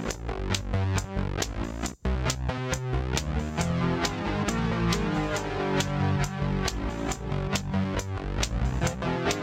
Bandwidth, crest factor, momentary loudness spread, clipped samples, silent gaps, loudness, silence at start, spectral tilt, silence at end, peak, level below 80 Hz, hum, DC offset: 16 kHz; 20 dB; 5 LU; under 0.1%; none; -29 LUFS; 0 s; -5 dB/octave; 0 s; -8 dBFS; -36 dBFS; none; under 0.1%